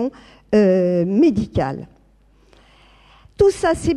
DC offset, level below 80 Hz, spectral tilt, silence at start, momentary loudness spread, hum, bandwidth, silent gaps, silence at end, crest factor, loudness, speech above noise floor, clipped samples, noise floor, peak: under 0.1%; -42 dBFS; -7 dB/octave; 0 s; 10 LU; none; 12 kHz; none; 0 s; 16 dB; -18 LUFS; 37 dB; under 0.1%; -54 dBFS; -2 dBFS